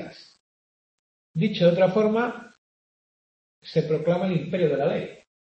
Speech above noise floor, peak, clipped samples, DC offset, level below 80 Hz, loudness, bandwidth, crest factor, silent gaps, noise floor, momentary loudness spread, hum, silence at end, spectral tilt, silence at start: over 67 dB; -6 dBFS; under 0.1%; under 0.1%; -68 dBFS; -24 LUFS; 7.8 kHz; 20 dB; 0.40-1.34 s, 2.58-3.62 s; under -90 dBFS; 14 LU; none; 0.45 s; -8 dB/octave; 0 s